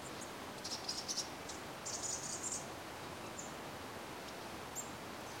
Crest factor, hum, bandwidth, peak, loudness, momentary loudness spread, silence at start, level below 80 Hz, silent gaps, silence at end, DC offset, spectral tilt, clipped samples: 20 dB; none; 16.5 kHz; -26 dBFS; -43 LUFS; 7 LU; 0 s; -68 dBFS; none; 0 s; under 0.1%; -2 dB/octave; under 0.1%